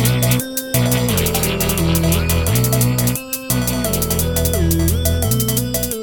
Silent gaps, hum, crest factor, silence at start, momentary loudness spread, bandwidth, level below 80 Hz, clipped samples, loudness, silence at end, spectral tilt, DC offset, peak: none; none; 16 dB; 0 s; 3 LU; 17.5 kHz; -26 dBFS; under 0.1%; -17 LUFS; 0 s; -4.5 dB/octave; under 0.1%; 0 dBFS